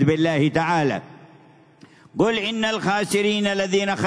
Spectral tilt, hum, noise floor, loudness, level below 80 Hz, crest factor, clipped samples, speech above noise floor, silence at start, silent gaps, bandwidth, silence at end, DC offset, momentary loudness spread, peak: -5 dB/octave; none; -51 dBFS; -21 LUFS; -58 dBFS; 16 dB; under 0.1%; 30 dB; 0 s; none; 11 kHz; 0 s; under 0.1%; 4 LU; -6 dBFS